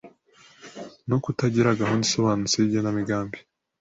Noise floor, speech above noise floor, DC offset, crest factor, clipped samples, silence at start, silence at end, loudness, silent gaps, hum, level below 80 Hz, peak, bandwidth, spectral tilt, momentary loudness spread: -55 dBFS; 32 dB; under 0.1%; 18 dB; under 0.1%; 0.05 s; 0.4 s; -23 LUFS; none; none; -56 dBFS; -8 dBFS; 8 kHz; -5 dB/octave; 19 LU